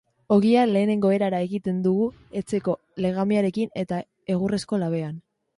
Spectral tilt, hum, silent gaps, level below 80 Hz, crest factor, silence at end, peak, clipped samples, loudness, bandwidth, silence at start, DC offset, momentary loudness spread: -7.5 dB/octave; none; none; -60 dBFS; 16 dB; 0.4 s; -6 dBFS; under 0.1%; -24 LUFS; 11.5 kHz; 0.3 s; under 0.1%; 10 LU